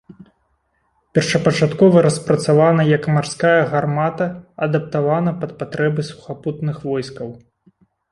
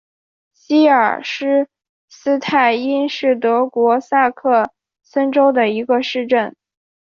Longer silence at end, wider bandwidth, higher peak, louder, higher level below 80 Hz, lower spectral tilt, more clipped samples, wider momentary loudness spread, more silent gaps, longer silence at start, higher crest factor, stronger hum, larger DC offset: first, 0.75 s vs 0.55 s; first, 11.5 kHz vs 7.2 kHz; about the same, -2 dBFS vs -2 dBFS; about the same, -18 LUFS vs -16 LUFS; first, -54 dBFS vs -66 dBFS; first, -6.5 dB/octave vs -5 dB/octave; neither; first, 13 LU vs 7 LU; second, none vs 1.89-2.08 s; second, 0.1 s vs 0.7 s; about the same, 16 dB vs 14 dB; neither; neither